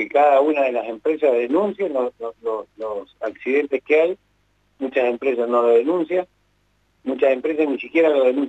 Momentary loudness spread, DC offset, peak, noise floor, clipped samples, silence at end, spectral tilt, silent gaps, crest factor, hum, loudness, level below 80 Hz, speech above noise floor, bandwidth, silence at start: 13 LU; under 0.1%; -6 dBFS; -64 dBFS; under 0.1%; 0 s; -6.5 dB/octave; none; 14 dB; 50 Hz at -65 dBFS; -20 LUFS; -66 dBFS; 44 dB; 8 kHz; 0 s